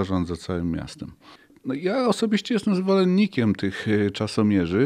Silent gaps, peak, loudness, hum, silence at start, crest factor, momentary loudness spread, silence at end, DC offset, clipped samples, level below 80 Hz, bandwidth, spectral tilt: none; -8 dBFS; -23 LUFS; none; 0 s; 16 dB; 11 LU; 0 s; under 0.1%; under 0.1%; -50 dBFS; 11 kHz; -6.5 dB/octave